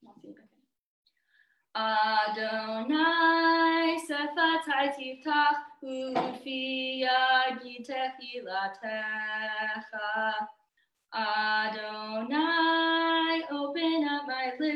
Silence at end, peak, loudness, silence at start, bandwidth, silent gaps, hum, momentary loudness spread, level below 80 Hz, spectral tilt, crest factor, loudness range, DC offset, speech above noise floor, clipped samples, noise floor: 0 s; -12 dBFS; -28 LUFS; 0.1 s; 12 kHz; 0.79-1.03 s; none; 12 LU; -84 dBFS; -3.5 dB/octave; 16 dB; 6 LU; under 0.1%; 46 dB; under 0.1%; -75 dBFS